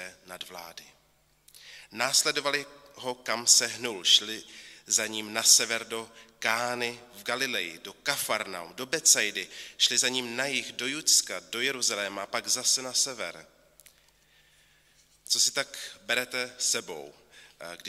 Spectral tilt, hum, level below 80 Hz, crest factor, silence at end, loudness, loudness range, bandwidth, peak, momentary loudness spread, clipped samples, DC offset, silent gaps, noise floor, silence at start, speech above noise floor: 0.5 dB/octave; none; -74 dBFS; 26 dB; 0 s; -26 LUFS; 7 LU; 16 kHz; -4 dBFS; 20 LU; under 0.1%; under 0.1%; none; -63 dBFS; 0 s; 34 dB